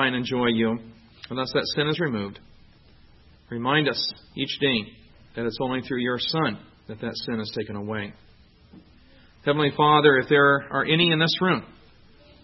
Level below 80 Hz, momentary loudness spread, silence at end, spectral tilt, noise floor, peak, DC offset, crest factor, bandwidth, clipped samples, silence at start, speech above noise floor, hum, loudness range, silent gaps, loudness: -58 dBFS; 15 LU; 0.7 s; -6.5 dB/octave; -53 dBFS; -2 dBFS; under 0.1%; 22 dB; 6 kHz; under 0.1%; 0 s; 30 dB; none; 9 LU; none; -23 LUFS